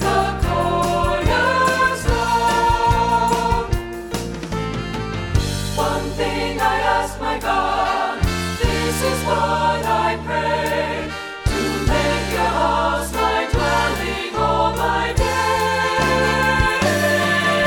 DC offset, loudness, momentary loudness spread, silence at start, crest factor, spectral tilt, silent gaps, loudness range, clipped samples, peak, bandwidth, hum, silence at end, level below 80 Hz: under 0.1%; -19 LUFS; 7 LU; 0 s; 16 dB; -4.5 dB/octave; none; 4 LU; under 0.1%; -2 dBFS; 19 kHz; none; 0 s; -30 dBFS